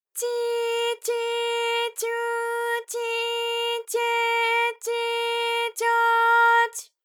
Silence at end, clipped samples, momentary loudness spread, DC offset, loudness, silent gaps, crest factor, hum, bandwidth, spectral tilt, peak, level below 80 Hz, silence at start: 0.2 s; under 0.1%; 8 LU; under 0.1%; -23 LUFS; none; 16 dB; none; 19.5 kHz; 4.5 dB/octave; -8 dBFS; under -90 dBFS; 0.15 s